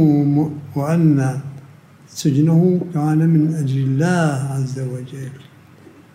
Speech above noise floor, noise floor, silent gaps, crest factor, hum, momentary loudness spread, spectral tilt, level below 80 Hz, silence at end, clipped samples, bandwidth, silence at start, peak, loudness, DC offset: 27 dB; -45 dBFS; none; 14 dB; none; 15 LU; -8 dB/octave; -62 dBFS; 0.75 s; under 0.1%; 13.5 kHz; 0 s; -4 dBFS; -18 LUFS; under 0.1%